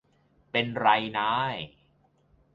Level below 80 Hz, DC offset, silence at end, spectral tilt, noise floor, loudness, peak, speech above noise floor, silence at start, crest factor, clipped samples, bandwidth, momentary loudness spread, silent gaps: -66 dBFS; under 0.1%; 0.85 s; -6.5 dB/octave; -66 dBFS; -27 LUFS; -6 dBFS; 39 dB; 0.55 s; 22 dB; under 0.1%; 7.4 kHz; 12 LU; none